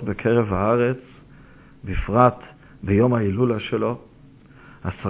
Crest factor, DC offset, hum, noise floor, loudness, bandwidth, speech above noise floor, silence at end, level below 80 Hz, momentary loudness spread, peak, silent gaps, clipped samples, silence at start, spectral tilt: 22 dB; under 0.1%; none; -48 dBFS; -21 LUFS; 4 kHz; 28 dB; 0 s; -38 dBFS; 16 LU; -2 dBFS; none; under 0.1%; 0 s; -11.5 dB/octave